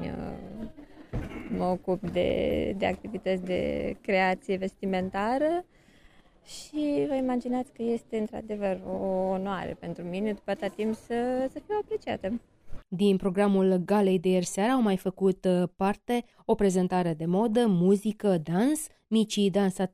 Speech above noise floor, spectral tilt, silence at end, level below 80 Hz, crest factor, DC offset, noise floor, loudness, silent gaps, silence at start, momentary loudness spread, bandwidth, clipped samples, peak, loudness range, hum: 30 dB; -6.5 dB/octave; 0.05 s; -52 dBFS; 16 dB; under 0.1%; -57 dBFS; -28 LUFS; none; 0 s; 11 LU; 14 kHz; under 0.1%; -12 dBFS; 6 LU; none